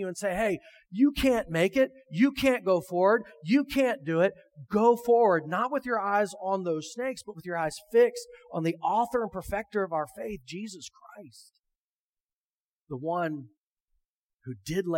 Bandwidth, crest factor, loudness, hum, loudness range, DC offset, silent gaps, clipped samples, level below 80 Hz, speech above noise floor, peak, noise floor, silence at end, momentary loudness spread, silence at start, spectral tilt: 17 kHz; 18 dB; -27 LUFS; none; 13 LU; under 0.1%; 11.59-11.63 s, 11.78-12.87 s, 13.57-13.86 s, 14.05-14.40 s; under 0.1%; -56 dBFS; over 62 dB; -10 dBFS; under -90 dBFS; 0 s; 15 LU; 0 s; -5.5 dB/octave